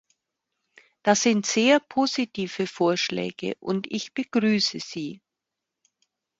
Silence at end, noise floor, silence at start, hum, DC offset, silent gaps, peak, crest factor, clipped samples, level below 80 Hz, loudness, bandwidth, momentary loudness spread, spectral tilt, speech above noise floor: 1.25 s; -85 dBFS; 1.05 s; none; under 0.1%; none; -4 dBFS; 22 dB; under 0.1%; -70 dBFS; -24 LUFS; 8 kHz; 11 LU; -3.5 dB/octave; 61 dB